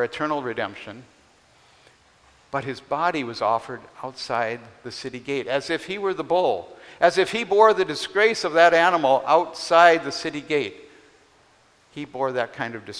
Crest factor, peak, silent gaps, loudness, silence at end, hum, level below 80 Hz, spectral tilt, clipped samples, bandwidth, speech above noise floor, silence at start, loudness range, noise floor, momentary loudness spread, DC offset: 22 dB; 0 dBFS; none; -22 LUFS; 0 s; none; -64 dBFS; -4 dB/octave; under 0.1%; 11 kHz; 36 dB; 0 s; 11 LU; -58 dBFS; 18 LU; under 0.1%